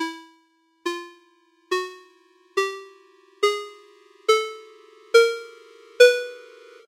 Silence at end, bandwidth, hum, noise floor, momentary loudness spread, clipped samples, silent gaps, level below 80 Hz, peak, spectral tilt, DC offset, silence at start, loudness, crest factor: 0.5 s; 16 kHz; none; -63 dBFS; 26 LU; under 0.1%; none; -90 dBFS; 0 dBFS; 1 dB/octave; under 0.1%; 0 s; -22 LUFS; 24 dB